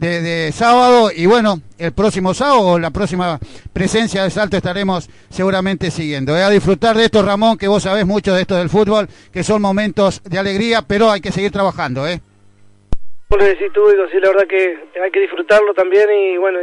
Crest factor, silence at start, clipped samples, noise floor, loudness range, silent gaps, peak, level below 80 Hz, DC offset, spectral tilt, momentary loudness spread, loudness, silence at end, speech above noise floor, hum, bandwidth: 12 dB; 0 s; under 0.1%; -46 dBFS; 4 LU; none; -2 dBFS; -36 dBFS; under 0.1%; -5.5 dB/octave; 9 LU; -14 LUFS; 0 s; 32 dB; none; 11 kHz